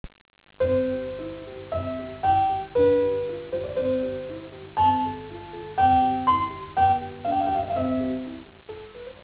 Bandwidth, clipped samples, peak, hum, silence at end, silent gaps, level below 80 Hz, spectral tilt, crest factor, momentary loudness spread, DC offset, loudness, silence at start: 4 kHz; under 0.1%; -10 dBFS; 50 Hz at -50 dBFS; 0 s; 0.21-0.25 s; -46 dBFS; -10 dB/octave; 14 dB; 18 LU; under 0.1%; -25 LUFS; 0.05 s